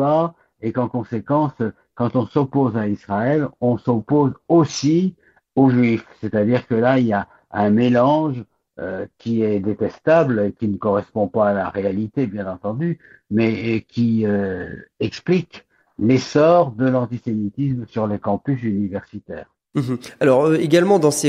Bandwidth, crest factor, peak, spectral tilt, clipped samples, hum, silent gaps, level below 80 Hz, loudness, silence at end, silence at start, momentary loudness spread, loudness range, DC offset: 14.5 kHz; 16 dB; -2 dBFS; -7 dB/octave; under 0.1%; none; none; -56 dBFS; -20 LUFS; 0 s; 0 s; 11 LU; 4 LU; under 0.1%